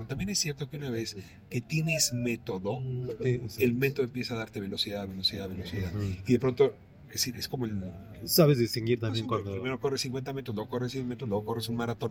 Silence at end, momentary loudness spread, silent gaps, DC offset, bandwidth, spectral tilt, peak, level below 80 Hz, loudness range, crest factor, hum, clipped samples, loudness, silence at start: 0 s; 9 LU; none; under 0.1%; 16.5 kHz; -4.5 dB/octave; -10 dBFS; -58 dBFS; 3 LU; 20 dB; none; under 0.1%; -30 LUFS; 0 s